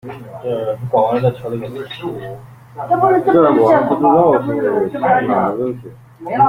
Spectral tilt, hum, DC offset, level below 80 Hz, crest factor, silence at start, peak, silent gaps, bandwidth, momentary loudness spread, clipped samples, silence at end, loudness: -8.5 dB/octave; none; under 0.1%; -52 dBFS; 14 dB; 0.05 s; -2 dBFS; none; 15.5 kHz; 18 LU; under 0.1%; 0 s; -15 LUFS